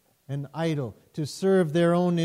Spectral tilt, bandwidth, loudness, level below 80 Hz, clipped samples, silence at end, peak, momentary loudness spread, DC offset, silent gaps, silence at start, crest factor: -7 dB/octave; 12.5 kHz; -26 LUFS; -68 dBFS; under 0.1%; 0 s; -12 dBFS; 13 LU; under 0.1%; none; 0.3 s; 14 dB